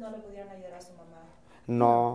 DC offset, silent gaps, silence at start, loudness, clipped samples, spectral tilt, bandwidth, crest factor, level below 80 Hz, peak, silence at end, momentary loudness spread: 0.1%; none; 0 s; -25 LUFS; under 0.1%; -8.5 dB/octave; 11 kHz; 22 dB; -64 dBFS; -8 dBFS; 0 s; 24 LU